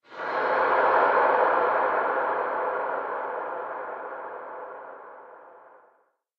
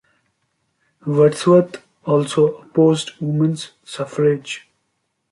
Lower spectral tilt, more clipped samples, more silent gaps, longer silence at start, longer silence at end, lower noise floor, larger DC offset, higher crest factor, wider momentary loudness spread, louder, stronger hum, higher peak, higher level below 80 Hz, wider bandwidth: about the same, -5.5 dB/octave vs -6.5 dB/octave; neither; neither; second, 0.1 s vs 1.05 s; about the same, 0.8 s vs 0.75 s; second, -66 dBFS vs -71 dBFS; neither; about the same, 18 dB vs 16 dB; first, 19 LU vs 16 LU; second, -25 LUFS vs -18 LUFS; neither; second, -8 dBFS vs -2 dBFS; second, -72 dBFS vs -64 dBFS; second, 6 kHz vs 11.5 kHz